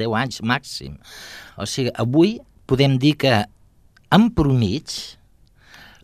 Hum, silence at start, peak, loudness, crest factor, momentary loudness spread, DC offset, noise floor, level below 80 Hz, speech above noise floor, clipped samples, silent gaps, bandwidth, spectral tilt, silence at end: none; 0 s; 0 dBFS; -19 LUFS; 20 dB; 20 LU; under 0.1%; -53 dBFS; -42 dBFS; 34 dB; under 0.1%; none; 14.5 kHz; -6 dB/octave; 0.9 s